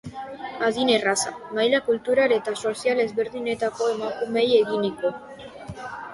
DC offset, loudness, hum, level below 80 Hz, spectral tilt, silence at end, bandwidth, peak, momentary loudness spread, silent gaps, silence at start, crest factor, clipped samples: under 0.1%; -23 LUFS; none; -60 dBFS; -3 dB/octave; 0 s; 11.5 kHz; -6 dBFS; 16 LU; none; 0.05 s; 18 dB; under 0.1%